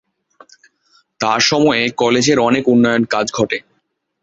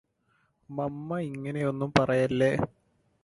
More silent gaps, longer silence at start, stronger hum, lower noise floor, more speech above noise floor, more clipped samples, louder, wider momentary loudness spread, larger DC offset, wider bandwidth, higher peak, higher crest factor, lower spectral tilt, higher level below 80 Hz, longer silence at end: neither; first, 1.2 s vs 0.7 s; neither; second, -67 dBFS vs -71 dBFS; first, 53 dB vs 44 dB; neither; first, -14 LUFS vs -28 LUFS; second, 7 LU vs 10 LU; neither; second, 8 kHz vs 11.5 kHz; about the same, -2 dBFS vs -4 dBFS; second, 16 dB vs 24 dB; second, -4 dB/octave vs -7 dB/octave; about the same, -54 dBFS vs -58 dBFS; about the same, 0.65 s vs 0.55 s